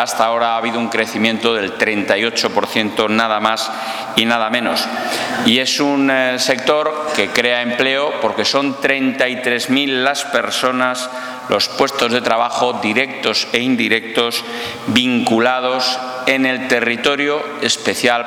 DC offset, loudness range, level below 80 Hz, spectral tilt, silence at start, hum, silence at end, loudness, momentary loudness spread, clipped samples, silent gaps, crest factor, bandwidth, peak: under 0.1%; 1 LU; -60 dBFS; -3 dB/octave; 0 s; none; 0 s; -16 LUFS; 4 LU; under 0.1%; none; 16 dB; 19 kHz; 0 dBFS